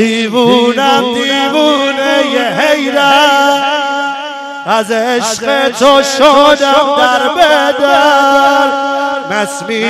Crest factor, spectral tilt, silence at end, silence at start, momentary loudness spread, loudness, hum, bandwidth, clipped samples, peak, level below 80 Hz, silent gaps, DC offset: 10 dB; -2.5 dB/octave; 0 s; 0 s; 8 LU; -9 LUFS; none; 16 kHz; 0.3%; 0 dBFS; -50 dBFS; none; under 0.1%